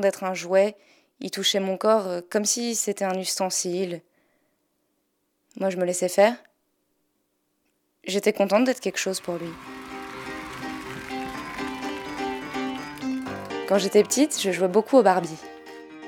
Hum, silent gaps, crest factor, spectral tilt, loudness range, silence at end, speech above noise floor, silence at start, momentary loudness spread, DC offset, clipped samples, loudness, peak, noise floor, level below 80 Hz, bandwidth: none; none; 22 dB; -3.5 dB/octave; 9 LU; 0 s; 50 dB; 0 s; 16 LU; under 0.1%; under 0.1%; -25 LUFS; -4 dBFS; -73 dBFS; -62 dBFS; 18.5 kHz